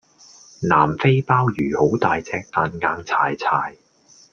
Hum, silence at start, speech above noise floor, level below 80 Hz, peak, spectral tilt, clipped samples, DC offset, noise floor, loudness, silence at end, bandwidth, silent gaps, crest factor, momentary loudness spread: none; 0.6 s; 33 dB; -54 dBFS; -2 dBFS; -7 dB/octave; under 0.1%; under 0.1%; -53 dBFS; -20 LUFS; 0.6 s; 7 kHz; none; 18 dB; 7 LU